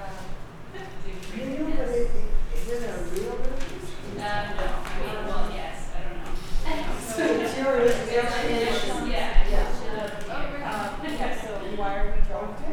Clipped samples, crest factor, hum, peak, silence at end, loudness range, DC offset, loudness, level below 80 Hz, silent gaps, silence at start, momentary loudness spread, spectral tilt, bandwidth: under 0.1%; 18 dB; none; -6 dBFS; 0 s; 7 LU; under 0.1%; -29 LUFS; -28 dBFS; none; 0 s; 13 LU; -5 dB/octave; 12.5 kHz